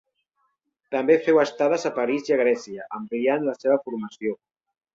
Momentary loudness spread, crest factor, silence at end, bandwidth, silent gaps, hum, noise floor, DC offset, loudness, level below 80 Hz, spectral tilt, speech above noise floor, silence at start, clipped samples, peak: 12 LU; 18 dB; 0.6 s; 7.6 kHz; none; none; -73 dBFS; under 0.1%; -23 LUFS; -70 dBFS; -5.5 dB/octave; 50 dB; 0.9 s; under 0.1%; -6 dBFS